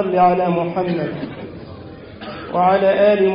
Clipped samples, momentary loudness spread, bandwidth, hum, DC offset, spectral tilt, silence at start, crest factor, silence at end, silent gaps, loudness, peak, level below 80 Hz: under 0.1%; 21 LU; 5.4 kHz; none; under 0.1%; -12 dB/octave; 0 s; 14 dB; 0 s; none; -17 LUFS; -4 dBFS; -50 dBFS